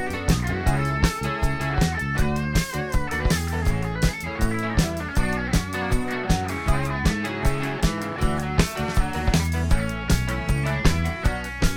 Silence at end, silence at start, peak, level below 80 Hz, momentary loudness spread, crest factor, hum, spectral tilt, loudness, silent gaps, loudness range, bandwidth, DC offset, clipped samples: 0 s; 0 s; -4 dBFS; -28 dBFS; 3 LU; 18 dB; none; -5.5 dB/octave; -24 LUFS; none; 1 LU; 18 kHz; under 0.1%; under 0.1%